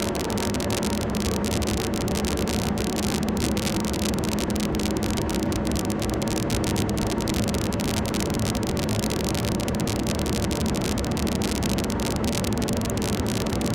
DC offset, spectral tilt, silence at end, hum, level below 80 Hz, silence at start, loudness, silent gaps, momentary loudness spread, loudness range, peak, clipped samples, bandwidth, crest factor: under 0.1%; -5 dB/octave; 0 s; none; -34 dBFS; 0 s; -25 LUFS; none; 1 LU; 0 LU; -6 dBFS; under 0.1%; 17 kHz; 18 dB